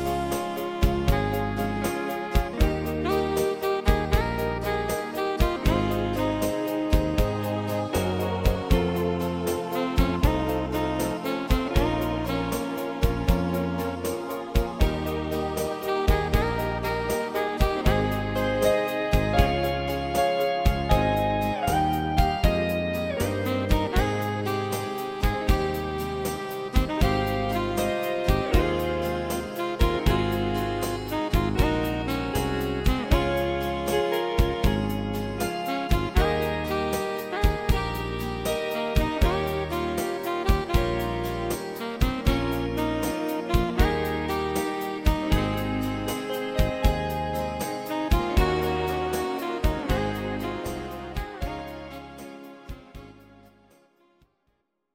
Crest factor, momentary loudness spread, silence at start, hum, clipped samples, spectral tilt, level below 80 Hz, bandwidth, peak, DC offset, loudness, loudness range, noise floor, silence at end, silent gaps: 20 dB; 6 LU; 0 s; none; under 0.1%; -6 dB/octave; -30 dBFS; 17 kHz; -4 dBFS; under 0.1%; -26 LUFS; 3 LU; -73 dBFS; 1.8 s; none